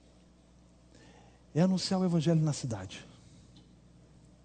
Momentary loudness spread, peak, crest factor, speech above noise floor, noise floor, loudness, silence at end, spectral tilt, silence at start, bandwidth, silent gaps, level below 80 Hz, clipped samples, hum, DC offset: 15 LU; -14 dBFS; 20 dB; 31 dB; -60 dBFS; -30 LUFS; 1.4 s; -6.5 dB/octave; 1.55 s; 9.4 kHz; none; -64 dBFS; under 0.1%; 60 Hz at -55 dBFS; under 0.1%